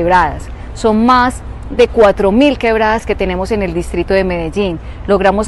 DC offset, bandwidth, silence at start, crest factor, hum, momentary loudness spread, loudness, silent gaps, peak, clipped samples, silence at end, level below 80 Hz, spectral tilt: under 0.1%; 12 kHz; 0 s; 12 dB; none; 10 LU; -13 LUFS; none; 0 dBFS; under 0.1%; 0 s; -26 dBFS; -6 dB/octave